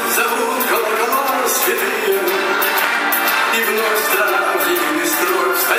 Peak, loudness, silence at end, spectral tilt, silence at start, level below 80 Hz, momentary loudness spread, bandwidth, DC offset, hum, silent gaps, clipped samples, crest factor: 0 dBFS; -15 LUFS; 0 s; -0.5 dB/octave; 0 s; -76 dBFS; 2 LU; 16 kHz; under 0.1%; none; none; under 0.1%; 16 dB